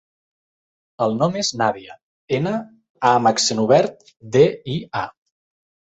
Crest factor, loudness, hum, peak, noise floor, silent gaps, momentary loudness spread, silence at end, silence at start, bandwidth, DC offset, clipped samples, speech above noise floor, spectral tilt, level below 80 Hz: 20 dB; -19 LUFS; none; -2 dBFS; under -90 dBFS; 2.03-2.28 s, 2.90-2.95 s; 12 LU; 0.85 s; 1 s; 8.4 kHz; under 0.1%; under 0.1%; over 71 dB; -4.5 dB/octave; -60 dBFS